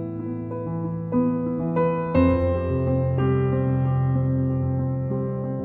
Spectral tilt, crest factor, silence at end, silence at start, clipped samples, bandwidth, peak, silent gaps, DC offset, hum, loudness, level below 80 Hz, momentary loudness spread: -12 dB/octave; 16 dB; 0 s; 0 s; under 0.1%; 4 kHz; -6 dBFS; none; under 0.1%; none; -24 LUFS; -42 dBFS; 8 LU